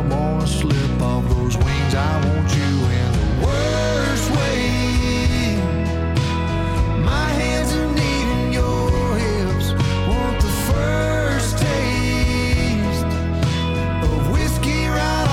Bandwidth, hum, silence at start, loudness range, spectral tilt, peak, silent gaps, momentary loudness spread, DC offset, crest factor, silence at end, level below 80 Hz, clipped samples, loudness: 16.5 kHz; none; 0 s; 1 LU; -5.5 dB/octave; -6 dBFS; none; 2 LU; under 0.1%; 12 dB; 0 s; -24 dBFS; under 0.1%; -19 LUFS